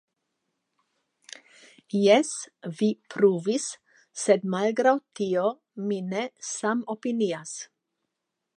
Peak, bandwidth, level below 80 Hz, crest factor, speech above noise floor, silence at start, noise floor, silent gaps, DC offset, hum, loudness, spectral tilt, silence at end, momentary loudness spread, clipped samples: -6 dBFS; 11 kHz; -80 dBFS; 22 dB; 58 dB; 1.95 s; -83 dBFS; none; under 0.1%; none; -26 LUFS; -4.5 dB/octave; 0.95 s; 19 LU; under 0.1%